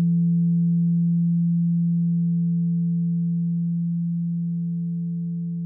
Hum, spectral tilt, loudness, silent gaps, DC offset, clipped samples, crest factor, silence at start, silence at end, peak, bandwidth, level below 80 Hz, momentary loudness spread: none; -24 dB/octave; -23 LUFS; none; under 0.1%; under 0.1%; 6 dB; 0 s; 0 s; -16 dBFS; 0.5 kHz; -70 dBFS; 7 LU